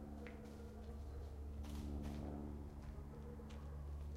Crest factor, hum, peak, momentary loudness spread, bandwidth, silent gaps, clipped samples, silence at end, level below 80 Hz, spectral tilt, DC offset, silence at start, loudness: 14 dB; none; -36 dBFS; 6 LU; 15 kHz; none; under 0.1%; 0 s; -52 dBFS; -7.5 dB/octave; under 0.1%; 0 s; -51 LUFS